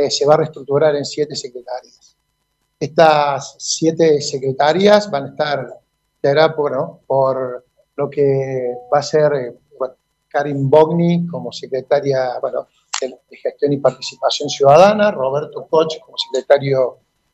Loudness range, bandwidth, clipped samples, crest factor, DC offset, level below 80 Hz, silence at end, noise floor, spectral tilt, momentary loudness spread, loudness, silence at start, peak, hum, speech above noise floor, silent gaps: 4 LU; 8.4 kHz; under 0.1%; 16 dB; under 0.1%; -62 dBFS; 0.4 s; -69 dBFS; -5 dB/octave; 15 LU; -16 LUFS; 0 s; 0 dBFS; none; 53 dB; none